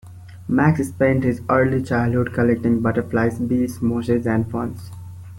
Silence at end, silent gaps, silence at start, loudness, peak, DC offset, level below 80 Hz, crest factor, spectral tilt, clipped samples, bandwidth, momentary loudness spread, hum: 0 s; none; 0.05 s; -20 LUFS; -4 dBFS; under 0.1%; -46 dBFS; 16 dB; -8.5 dB/octave; under 0.1%; 16.5 kHz; 10 LU; none